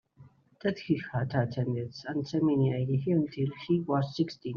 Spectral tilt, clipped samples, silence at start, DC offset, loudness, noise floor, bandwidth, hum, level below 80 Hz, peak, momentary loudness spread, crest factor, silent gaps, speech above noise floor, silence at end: -7.5 dB/octave; under 0.1%; 0.2 s; under 0.1%; -30 LUFS; -58 dBFS; 6.8 kHz; none; -66 dBFS; -12 dBFS; 7 LU; 18 dB; none; 28 dB; 0 s